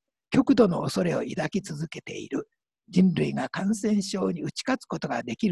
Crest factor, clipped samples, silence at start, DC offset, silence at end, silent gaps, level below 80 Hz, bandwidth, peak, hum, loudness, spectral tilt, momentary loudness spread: 20 dB; under 0.1%; 0.3 s; under 0.1%; 0 s; none; -60 dBFS; 12 kHz; -6 dBFS; none; -26 LUFS; -6 dB/octave; 12 LU